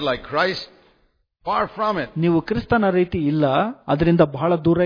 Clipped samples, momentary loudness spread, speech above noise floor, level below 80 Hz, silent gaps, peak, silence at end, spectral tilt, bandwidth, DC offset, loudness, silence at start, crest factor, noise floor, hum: under 0.1%; 5 LU; 44 dB; -44 dBFS; none; -2 dBFS; 0 s; -8.5 dB/octave; 5.2 kHz; under 0.1%; -20 LUFS; 0 s; 18 dB; -64 dBFS; none